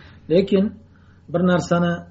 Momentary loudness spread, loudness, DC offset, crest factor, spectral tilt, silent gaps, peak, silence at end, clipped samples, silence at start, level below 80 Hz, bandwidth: 7 LU; -20 LUFS; under 0.1%; 16 dB; -6.5 dB/octave; none; -6 dBFS; 0.05 s; under 0.1%; 0.3 s; -54 dBFS; 8 kHz